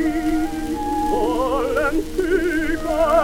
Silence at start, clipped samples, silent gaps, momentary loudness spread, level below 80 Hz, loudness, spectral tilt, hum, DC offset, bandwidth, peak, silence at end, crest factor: 0 s; under 0.1%; none; 4 LU; -32 dBFS; -21 LUFS; -5.5 dB/octave; none; under 0.1%; 16.5 kHz; -6 dBFS; 0 s; 14 dB